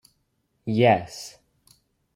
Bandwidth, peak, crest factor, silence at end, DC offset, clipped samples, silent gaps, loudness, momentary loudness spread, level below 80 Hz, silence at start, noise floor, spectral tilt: 15.5 kHz; -4 dBFS; 22 dB; 0.85 s; under 0.1%; under 0.1%; none; -21 LUFS; 20 LU; -64 dBFS; 0.65 s; -72 dBFS; -6 dB/octave